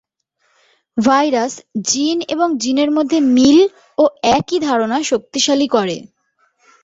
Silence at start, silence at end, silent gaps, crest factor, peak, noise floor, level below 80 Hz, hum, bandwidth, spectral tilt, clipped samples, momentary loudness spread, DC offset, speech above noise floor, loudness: 0.95 s; 0.8 s; none; 16 dB; 0 dBFS; -65 dBFS; -54 dBFS; none; 8 kHz; -3.5 dB/octave; under 0.1%; 8 LU; under 0.1%; 50 dB; -15 LUFS